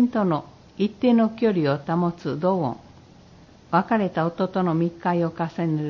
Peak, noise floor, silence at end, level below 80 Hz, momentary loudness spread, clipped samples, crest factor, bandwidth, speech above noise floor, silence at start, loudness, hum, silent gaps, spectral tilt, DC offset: -6 dBFS; -49 dBFS; 0 s; -58 dBFS; 8 LU; under 0.1%; 16 dB; 6.6 kHz; 27 dB; 0 s; -23 LUFS; none; none; -9 dB/octave; under 0.1%